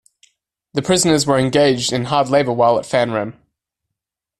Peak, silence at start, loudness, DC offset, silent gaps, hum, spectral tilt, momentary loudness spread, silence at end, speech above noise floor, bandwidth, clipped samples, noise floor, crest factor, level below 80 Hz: -2 dBFS; 0.75 s; -16 LUFS; under 0.1%; none; none; -4.5 dB/octave; 10 LU; 1.1 s; 66 dB; 13.5 kHz; under 0.1%; -82 dBFS; 16 dB; -52 dBFS